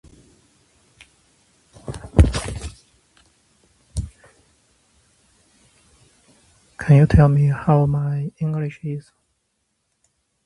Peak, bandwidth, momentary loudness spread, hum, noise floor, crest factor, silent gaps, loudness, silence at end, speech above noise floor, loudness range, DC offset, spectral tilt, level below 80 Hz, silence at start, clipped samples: 0 dBFS; 11.5 kHz; 21 LU; none; -72 dBFS; 22 dB; none; -19 LUFS; 1.45 s; 55 dB; 22 LU; under 0.1%; -8 dB/octave; -32 dBFS; 1.9 s; under 0.1%